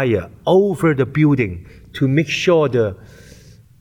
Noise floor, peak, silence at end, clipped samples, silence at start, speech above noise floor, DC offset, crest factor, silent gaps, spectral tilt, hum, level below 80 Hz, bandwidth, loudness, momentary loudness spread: -44 dBFS; -4 dBFS; 0.85 s; under 0.1%; 0 s; 27 dB; under 0.1%; 14 dB; none; -7 dB/octave; none; -46 dBFS; 15.5 kHz; -17 LUFS; 8 LU